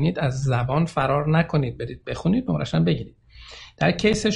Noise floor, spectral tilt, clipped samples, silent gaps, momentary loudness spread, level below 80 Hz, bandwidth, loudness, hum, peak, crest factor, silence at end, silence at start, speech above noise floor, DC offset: -44 dBFS; -6.5 dB/octave; under 0.1%; none; 14 LU; -44 dBFS; 11 kHz; -23 LUFS; none; -6 dBFS; 16 dB; 0 s; 0 s; 22 dB; under 0.1%